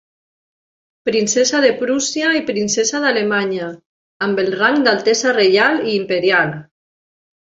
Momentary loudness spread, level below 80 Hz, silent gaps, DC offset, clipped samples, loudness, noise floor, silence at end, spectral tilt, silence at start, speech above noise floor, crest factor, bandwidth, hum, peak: 9 LU; -62 dBFS; 3.86-4.20 s; under 0.1%; under 0.1%; -16 LUFS; under -90 dBFS; 0.8 s; -3 dB/octave; 1.05 s; over 74 dB; 16 dB; 7.8 kHz; none; -2 dBFS